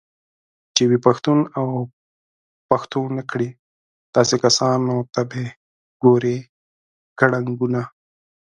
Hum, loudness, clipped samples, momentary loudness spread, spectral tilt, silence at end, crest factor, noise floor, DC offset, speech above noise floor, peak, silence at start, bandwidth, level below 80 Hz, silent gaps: none; -20 LUFS; under 0.1%; 12 LU; -5 dB/octave; 0.6 s; 20 dB; under -90 dBFS; under 0.1%; over 71 dB; 0 dBFS; 0.75 s; 10.5 kHz; -62 dBFS; 1.93-2.69 s, 3.59-4.13 s, 5.56-6.00 s, 6.49-7.16 s